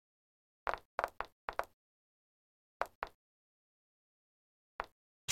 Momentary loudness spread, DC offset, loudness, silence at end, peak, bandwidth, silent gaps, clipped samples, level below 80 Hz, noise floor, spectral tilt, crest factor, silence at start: 8 LU; under 0.1%; -44 LUFS; 0 s; -16 dBFS; 16.5 kHz; 0.85-0.98 s, 1.32-1.48 s, 1.73-2.80 s, 2.95-3.02 s, 3.15-4.79 s, 4.92-5.28 s; under 0.1%; -66 dBFS; under -90 dBFS; -2 dB/octave; 32 dB; 0.65 s